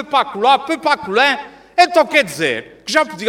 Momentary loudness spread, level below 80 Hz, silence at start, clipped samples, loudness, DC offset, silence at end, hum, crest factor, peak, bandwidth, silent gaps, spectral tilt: 7 LU; -58 dBFS; 0 s; under 0.1%; -15 LUFS; under 0.1%; 0 s; none; 16 dB; 0 dBFS; 18 kHz; none; -3 dB/octave